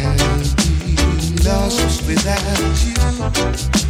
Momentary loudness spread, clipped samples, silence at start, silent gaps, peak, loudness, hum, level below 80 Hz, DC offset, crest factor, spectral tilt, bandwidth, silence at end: 2 LU; under 0.1%; 0 s; none; -2 dBFS; -17 LUFS; none; -20 dBFS; under 0.1%; 14 dB; -4.5 dB/octave; 16 kHz; 0 s